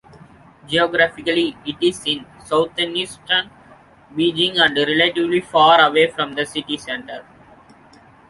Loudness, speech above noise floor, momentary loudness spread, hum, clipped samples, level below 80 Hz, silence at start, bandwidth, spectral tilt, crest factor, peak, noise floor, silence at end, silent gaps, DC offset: -18 LUFS; 30 dB; 12 LU; none; under 0.1%; -56 dBFS; 0.7 s; 11.5 kHz; -4 dB/octave; 18 dB; -2 dBFS; -48 dBFS; 1.1 s; none; under 0.1%